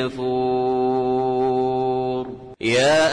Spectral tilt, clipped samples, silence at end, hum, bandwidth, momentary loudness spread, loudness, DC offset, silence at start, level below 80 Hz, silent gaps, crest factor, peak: -5 dB/octave; under 0.1%; 0 s; none; 10.5 kHz; 9 LU; -21 LUFS; under 0.1%; 0 s; -52 dBFS; none; 12 dB; -8 dBFS